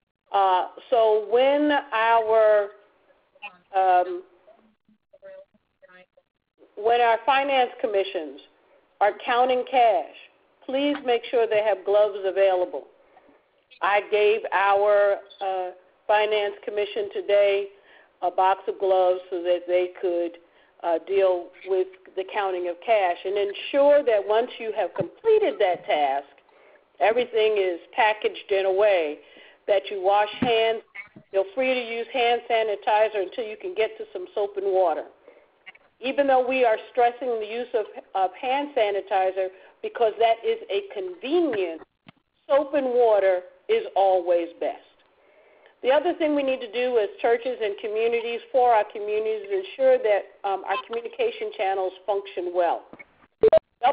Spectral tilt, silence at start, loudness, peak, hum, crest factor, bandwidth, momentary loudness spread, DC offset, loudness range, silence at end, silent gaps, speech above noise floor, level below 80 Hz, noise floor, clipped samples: -8 dB/octave; 0.3 s; -23 LUFS; -8 dBFS; none; 16 dB; 5 kHz; 11 LU; under 0.1%; 3 LU; 0 s; none; 39 dB; -68 dBFS; -62 dBFS; under 0.1%